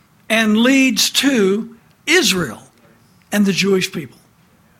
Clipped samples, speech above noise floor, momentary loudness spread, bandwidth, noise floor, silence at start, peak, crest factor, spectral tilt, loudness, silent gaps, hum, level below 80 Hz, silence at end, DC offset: under 0.1%; 38 dB; 13 LU; 16.5 kHz; -53 dBFS; 0.3 s; -2 dBFS; 16 dB; -3.5 dB/octave; -15 LUFS; none; none; -56 dBFS; 0.7 s; under 0.1%